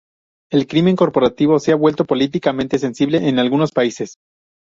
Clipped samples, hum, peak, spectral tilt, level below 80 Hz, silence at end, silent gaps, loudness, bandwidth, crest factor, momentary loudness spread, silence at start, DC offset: under 0.1%; none; -2 dBFS; -6.5 dB/octave; -54 dBFS; 0.55 s; none; -16 LUFS; 7.6 kHz; 14 dB; 6 LU; 0.5 s; under 0.1%